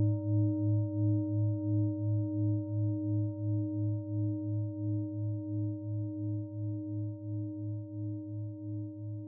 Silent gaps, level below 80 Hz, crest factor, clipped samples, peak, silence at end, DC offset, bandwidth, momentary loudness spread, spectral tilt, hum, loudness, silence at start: none; -74 dBFS; 12 dB; under 0.1%; -20 dBFS; 0 s; under 0.1%; 1 kHz; 9 LU; -16 dB/octave; none; -34 LUFS; 0 s